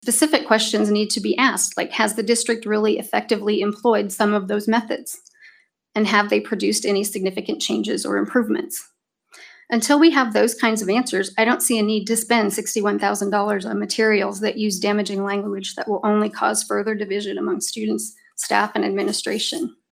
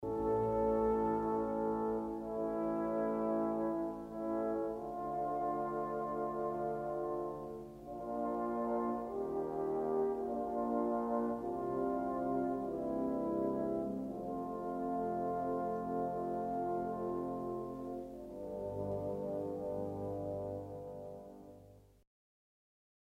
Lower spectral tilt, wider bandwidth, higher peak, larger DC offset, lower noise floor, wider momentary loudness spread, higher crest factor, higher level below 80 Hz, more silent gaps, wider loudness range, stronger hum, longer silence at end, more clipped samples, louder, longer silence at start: second, -3 dB/octave vs -9.5 dB/octave; about the same, 16 kHz vs 15.5 kHz; first, -2 dBFS vs -22 dBFS; neither; second, -53 dBFS vs -60 dBFS; about the same, 7 LU vs 8 LU; about the same, 18 dB vs 14 dB; second, -68 dBFS vs -62 dBFS; neither; about the same, 4 LU vs 5 LU; second, none vs 50 Hz at -65 dBFS; second, 0.2 s vs 1.25 s; neither; first, -20 LUFS vs -38 LUFS; about the same, 0.05 s vs 0 s